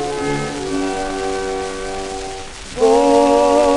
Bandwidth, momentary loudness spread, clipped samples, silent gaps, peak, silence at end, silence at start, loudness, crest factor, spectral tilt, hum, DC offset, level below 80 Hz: 11.5 kHz; 14 LU; under 0.1%; none; -2 dBFS; 0 s; 0 s; -17 LUFS; 14 dB; -4.5 dB/octave; none; under 0.1%; -36 dBFS